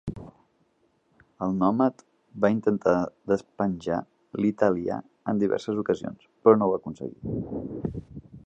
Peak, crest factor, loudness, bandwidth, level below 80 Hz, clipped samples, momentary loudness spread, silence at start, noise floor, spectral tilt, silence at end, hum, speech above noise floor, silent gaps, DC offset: -4 dBFS; 22 dB; -26 LUFS; 8 kHz; -54 dBFS; under 0.1%; 15 LU; 0.05 s; -68 dBFS; -8.5 dB/octave; 0.05 s; none; 43 dB; none; under 0.1%